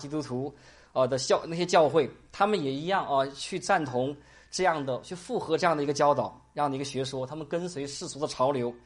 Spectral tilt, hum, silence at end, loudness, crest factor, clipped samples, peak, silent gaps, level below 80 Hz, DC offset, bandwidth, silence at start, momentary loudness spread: -4.5 dB/octave; none; 0.05 s; -28 LUFS; 18 dB; under 0.1%; -10 dBFS; none; -62 dBFS; under 0.1%; 11.5 kHz; 0 s; 10 LU